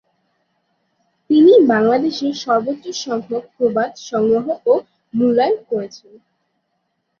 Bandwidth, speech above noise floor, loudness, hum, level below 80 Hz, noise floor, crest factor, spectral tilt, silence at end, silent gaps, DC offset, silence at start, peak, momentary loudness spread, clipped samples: 7 kHz; 53 dB; -17 LUFS; none; -64 dBFS; -71 dBFS; 16 dB; -5.5 dB/octave; 1.25 s; none; under 0.1%; 1.3 s; -2 dBFS; 14 LU; under 0.1%